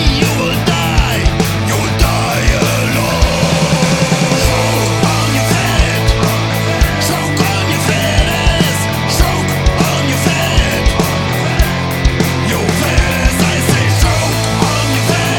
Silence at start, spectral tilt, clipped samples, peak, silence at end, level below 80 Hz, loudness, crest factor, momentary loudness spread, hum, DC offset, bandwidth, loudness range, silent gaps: 0 s; -4.5 dB/octave; under 0.1%; 0 dBFS; 0 s; -20 dBFS; -13 LUFS; 12 dB; 2 LU; none; under 0.1%; 19 kHz; 1 LU; none